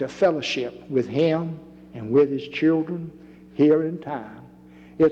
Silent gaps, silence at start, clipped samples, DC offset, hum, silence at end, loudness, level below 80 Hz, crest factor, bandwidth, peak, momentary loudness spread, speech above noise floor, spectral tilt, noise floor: none; 0 s; under 0.1%; under 0.1%; none; 0 s; -23 LUFS; -60 dBFS; 16 dB; 7.8 kHz; -8 dBFS; 18 LU; 25 dB; -7 dB/octave; -47 dBFS